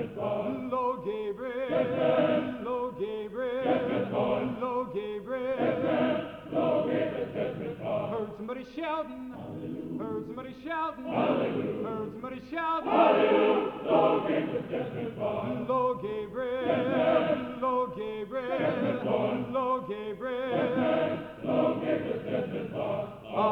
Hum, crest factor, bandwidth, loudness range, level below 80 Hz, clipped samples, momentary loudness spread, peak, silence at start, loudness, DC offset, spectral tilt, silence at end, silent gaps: none; 20 dB; 6 kHz; 6 LU; -62 dBFS; under 0.1%; 10 LU; -10 dBFS; 0 s; -30 LUFS; under 0.1%; -8 dB/octave; 0 s; none